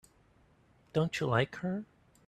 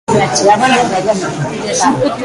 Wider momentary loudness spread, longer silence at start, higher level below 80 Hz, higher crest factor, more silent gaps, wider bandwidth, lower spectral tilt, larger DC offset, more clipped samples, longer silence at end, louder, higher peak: first, 10 LU vs 7 LU; first, 0.95 s vs 0.1 s; second, -66 dBFS vs -44 dBFS; first, 22 dB vs 12 dB; neither; about the same, 12.5 kHz vs 11.5 kHz; first, -6.5 dB/octave vs -4 dB/octave; neither; neither; first, 0.45 s vs 0 s; second, -33 LUFS vs -12 LUFS; second, -14 dBFS vs 0 dBFS